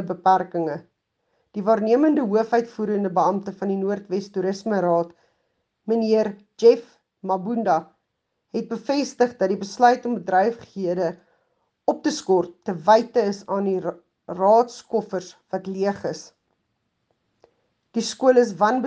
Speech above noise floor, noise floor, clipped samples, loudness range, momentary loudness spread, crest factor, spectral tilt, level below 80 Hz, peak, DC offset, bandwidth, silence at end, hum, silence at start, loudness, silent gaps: 55 dB; -77 dBFS; under 0.1%; 3 LU; 13 LU; 20 dB; -5.5 dB/octave; -72 dBFS; -2 dBFS; under 0.1%; 9.2 kHz; 0 s; none; 0 s; -22 LUFS; none